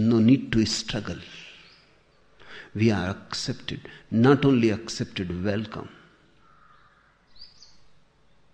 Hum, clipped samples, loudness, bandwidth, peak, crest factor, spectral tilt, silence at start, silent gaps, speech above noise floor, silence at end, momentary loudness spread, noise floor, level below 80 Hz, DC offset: none; under 0.1%; -24 LUFS; 9.6 kHz; -6 dBFS; 20 dB; -6 dB/octave; 0 s; none; 36 dB; 1.05 s; 22 LU; -60 dBFS; -52 dBFS; under 0.1%